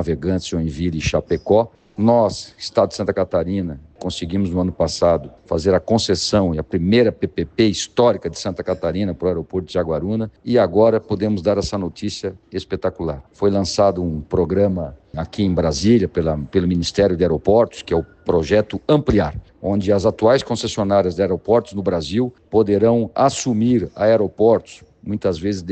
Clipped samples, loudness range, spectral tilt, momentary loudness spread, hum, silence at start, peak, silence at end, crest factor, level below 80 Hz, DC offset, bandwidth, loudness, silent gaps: under 0.1%; 3 LU; -6 dB/octave; 9 LU; none; 0 s; -2 dBFS; 0 s; 16 dB; -40 dBFS; under 0.1%; 9 kHz; -19 LUFS; none